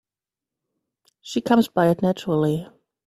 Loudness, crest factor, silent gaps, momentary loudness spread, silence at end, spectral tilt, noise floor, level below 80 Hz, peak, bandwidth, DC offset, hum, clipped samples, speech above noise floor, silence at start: -21 LUFS; 20 dB; none; 10 LU; 0.4 s; -7 dB/octave; -89 dBFS; -62 dBFS; -4 dBFS; 15.5 kHz; under 0.1%; none; under 0.1%; 69 dB; 1.25 s